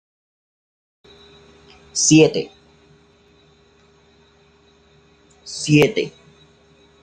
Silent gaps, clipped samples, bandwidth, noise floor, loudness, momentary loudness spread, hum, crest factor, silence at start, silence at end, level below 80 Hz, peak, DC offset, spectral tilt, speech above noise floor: none; under 0.1%; 10 kHz; -54 dBFS; -16 LUFS; 21 LU; none; 22 dB; 1.95 s; 0.95 s; -58 dBFS; -2 dBFS; under 0.1%; -4 dB/octave; 39 dB